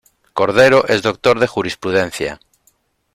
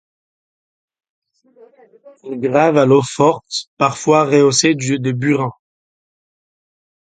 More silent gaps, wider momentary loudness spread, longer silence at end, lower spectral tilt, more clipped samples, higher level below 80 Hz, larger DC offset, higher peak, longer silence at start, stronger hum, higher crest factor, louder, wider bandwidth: second, none vs 3.67-3.77 s; about the same, 13 LU vs 11 LU; second, 0.8 s vs 1.55 s; about the same, -4.5 dB/octave vs -5 dB/octave; neither; first, -50 dBFS vs -60 dBFS; neither; about the same, 0 dBFS vs 0 dBFS; second, 0.35 s vs 2.05 s; neither; about the same, 16 dB vs 18 dB; about the same, -15 LUFS vs -15 LUFS; first, 14.5 kHz vs 9.4 kHz